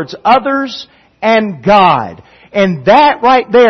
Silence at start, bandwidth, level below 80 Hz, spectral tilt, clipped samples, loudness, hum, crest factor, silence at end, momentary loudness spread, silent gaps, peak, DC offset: 0 s; 6.4 kHz; -48 dBFS; -6 dB/octave; 0.1%; -10 LUFS; none; 10 dB; 0 s; 12 LU; none; 0 dBFS; under 0.1%